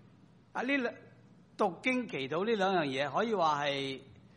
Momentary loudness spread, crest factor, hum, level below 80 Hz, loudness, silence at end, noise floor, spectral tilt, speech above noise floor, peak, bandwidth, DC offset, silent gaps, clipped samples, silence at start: 9 LU; 18 dB; none; -76 dBFS; -32 LUFS; 0.25 s; -60 dBFS; -5 dB/octave; 28 dB; -16 dBFS; 10 kHz; under 0.1%; none; under 0.1%; 0.55 s